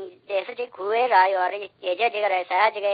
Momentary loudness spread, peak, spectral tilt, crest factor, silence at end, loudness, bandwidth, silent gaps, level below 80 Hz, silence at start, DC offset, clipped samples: 12 LU; -6 dBFS; -6 dB/octave; 18 dB; 0 s; -23 LUFS; 5 kHz; none; -88 dBFS; 0 s; under 0.1%; under 0.1%